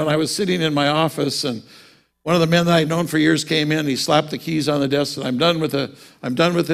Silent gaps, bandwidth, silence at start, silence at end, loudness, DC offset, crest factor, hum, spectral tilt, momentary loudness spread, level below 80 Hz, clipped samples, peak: none; 16 kHz; 0 s; 0 s; -19 LUFS; under 0.1%; 18 dB; none; -5 dB/octave; 9 LU; -56 dBFS; under 0.1%; -2 dBFS